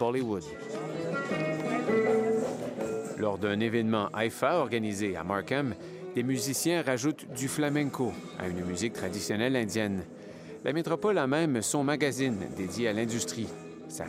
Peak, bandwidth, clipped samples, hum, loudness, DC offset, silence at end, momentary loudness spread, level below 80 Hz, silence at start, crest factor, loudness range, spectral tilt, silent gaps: -12 dBFS; 16 kHz; under 0.1%; none; -30 LUFS; under 0.1%; 0 s; 9 LU; -70 dBFS; 0 s; 18 dB; 2 LU; -5 dB/octave; none